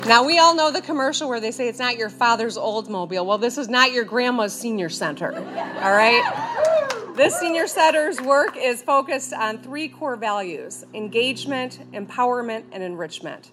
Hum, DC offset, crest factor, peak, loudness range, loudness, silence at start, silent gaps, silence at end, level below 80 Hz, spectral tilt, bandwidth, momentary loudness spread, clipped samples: none; under 0.1%; 22 dB; 0 dBFS; 7 LU; -21 LUFS; 0 s; none; 0.15 s; -76 dBFS; -2.5 dB/octave; 15 kHz; 14 LU; under 0.1%